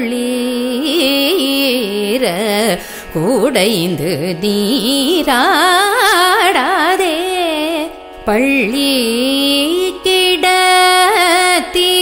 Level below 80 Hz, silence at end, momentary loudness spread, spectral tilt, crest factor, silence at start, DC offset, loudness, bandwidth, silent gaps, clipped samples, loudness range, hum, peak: -44 dBFS; 0 s; 8 LU; -3 dB/octave; 12 dB; 0 s; under 0.1%; -12 LUFS; 16.5 kHz; none; under 0.1%; 4 LU; none; 0 dBFS